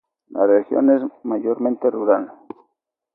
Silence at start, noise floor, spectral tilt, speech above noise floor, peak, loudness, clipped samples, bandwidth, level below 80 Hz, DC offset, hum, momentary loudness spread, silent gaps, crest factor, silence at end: 0.3 s; -73 dBFS; -12 dB/octave; 55 dB; -2 dBFS; -19 LUFS; under 0.1%; 2.7 kHz; -74 dBFS; under 0.1%; none; 9 LU; none; 18 dB; 0.85 s